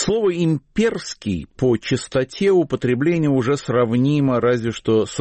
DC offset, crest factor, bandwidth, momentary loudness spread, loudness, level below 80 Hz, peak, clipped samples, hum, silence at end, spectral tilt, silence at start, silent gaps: under 0.1%; 12 dB; 8.8 kHz; 5 LU; -19 LUFS; -48 dBFS; -8 dBFS; under 0.1%; none; 0 s; -6.5 dB/octave; 0 s; none